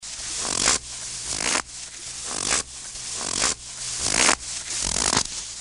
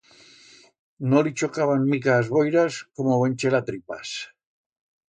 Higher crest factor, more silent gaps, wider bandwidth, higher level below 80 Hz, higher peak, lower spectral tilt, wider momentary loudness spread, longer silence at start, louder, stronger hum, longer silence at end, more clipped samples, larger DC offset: first, 26 dB vs 18 dB; neither; first, 11.5 kHz vs 9.4 kHz; first, -46 dBFS vs -66 dBFS; first, 0 dBFS vs -6 dBFS; second, 0 dB/octave vs -6 dB/octave; about the same, 12 LU vs 12 LU; second, 0 s vs 1 s; about the same, -23 LUFS vs -23 LUFS; neither; second, 0 s vs 0.85 s; neither; neither